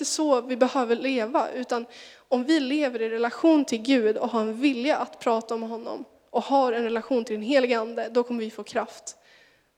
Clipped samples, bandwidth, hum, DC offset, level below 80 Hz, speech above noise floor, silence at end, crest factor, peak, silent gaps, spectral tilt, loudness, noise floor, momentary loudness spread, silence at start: under 0.1%; 15 kHz; none; under 0.1%; -76 dBFS; 33 dB; 0.65 s; 18 dB; -6 dBFS; none; -3.5 dB/octave; -25 LUFS; -58 dBFS; 9 LU; 0 s